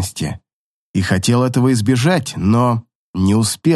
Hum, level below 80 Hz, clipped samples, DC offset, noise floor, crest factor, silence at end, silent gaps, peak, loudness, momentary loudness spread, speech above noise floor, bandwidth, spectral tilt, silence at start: none; -50 dBFS; under 0.1%; under 0.1%; -52 dBFS; 14 dB; 0 s; 0.53-0.94 s, 2.95-3.14 s; -2 dBFS; -16 LUFS; 10 LU; 37 dB; 12.5 kHz; -5.5 dB/octave; 0 s